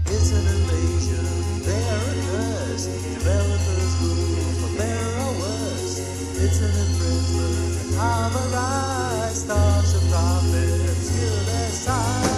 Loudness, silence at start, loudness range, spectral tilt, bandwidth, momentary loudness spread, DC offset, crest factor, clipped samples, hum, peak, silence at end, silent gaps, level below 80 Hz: -22 LUFS; 0 s; 2 LU; -5 dB/octave; 13 kHz; 5 LU; under 0.1%; 14 dB; under 0.1%; none; -8 dBFS; 0 s; none; -30 dBFS